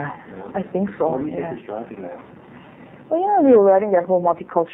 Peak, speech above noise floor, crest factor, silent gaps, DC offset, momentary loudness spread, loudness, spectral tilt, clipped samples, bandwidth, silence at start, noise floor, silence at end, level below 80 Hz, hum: -4 dBFS; 24 dB; 16 dB; none; under 0.1%; 21 LU; -19 LUFS; -11.5 dB/octave; under 0.1%; 3.7 kHz; 0 s; -43 dBFS; 0 s; -60 dBFS; none